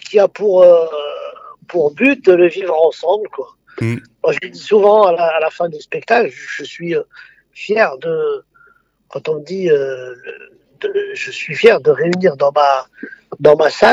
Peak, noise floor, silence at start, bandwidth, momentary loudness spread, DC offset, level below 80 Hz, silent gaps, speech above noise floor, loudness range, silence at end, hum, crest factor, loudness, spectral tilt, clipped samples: 0 dBFS; -52 dBFS; 0.05 s; 8 kHz; 18 LU; under 0.1%; -60 dBFS; none; 38 dB; 7 LU; 0 s; none; 14 dB; -14 LUFS; -6 dB/octave; under 0.1%